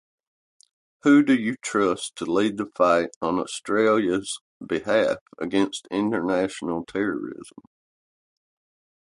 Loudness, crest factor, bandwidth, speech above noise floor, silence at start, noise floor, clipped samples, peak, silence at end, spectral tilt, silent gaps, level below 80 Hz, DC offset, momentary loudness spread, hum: -23 LUFS; 18 dB; 11.5 kHz; over 67 dB; 1.05 s; under -90 dBFS; under 0.1%; -6 dBFS; 1.7 s; -5 dB/octave; 3.16-3.21 s, 4.41-4.60 s, 5.21-5.26 s; -62 dBFS; under 0.1%; 11 LU; none